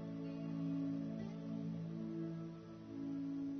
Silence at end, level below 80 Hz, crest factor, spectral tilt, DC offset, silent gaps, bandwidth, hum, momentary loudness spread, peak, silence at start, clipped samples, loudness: 0 s; -74 dBFS; 10 dB; -9 dB/octave; under 0.1%; none; 6.4 kHz; none; 7 LU; -32 dBFS; 0 s; under 0.1%; -45 LUFS